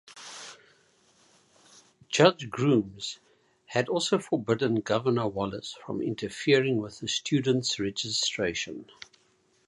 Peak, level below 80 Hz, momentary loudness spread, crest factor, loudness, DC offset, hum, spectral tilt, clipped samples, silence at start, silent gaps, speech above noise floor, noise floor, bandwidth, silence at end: -4 dBFS; -64 dBFS; 18 LU; 26 dB; -27 LUFS; under 0.1%; none; -4.5 dB/octave; under 0.1%; 0.05 s; none; 40 dB; -67 dBFS; 11.5 kHz; 0.85 s